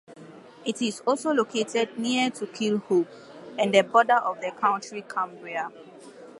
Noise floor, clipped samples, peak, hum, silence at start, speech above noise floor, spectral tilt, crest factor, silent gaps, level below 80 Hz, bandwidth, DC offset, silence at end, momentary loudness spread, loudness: -47 dBFS; under 0.1%; -4 dBFS; none; 0.1 s; 21 dB; -4 dB/octave; 22 dB; none; -80 dBFS; 11.5 kHz; under 0.1%; 0 s; 13 LU; -25 LUFS